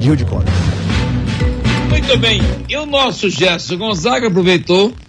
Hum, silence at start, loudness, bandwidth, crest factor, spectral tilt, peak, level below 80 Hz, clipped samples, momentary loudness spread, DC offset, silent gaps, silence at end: none; 0 s; -14 LUFS; 10.5 kHz; 14 dB; -5.5 dB/octave; 0 dBFS; -24 dBFS; under 0.1%; 6 LU; under 0.1%; none; 0.05 s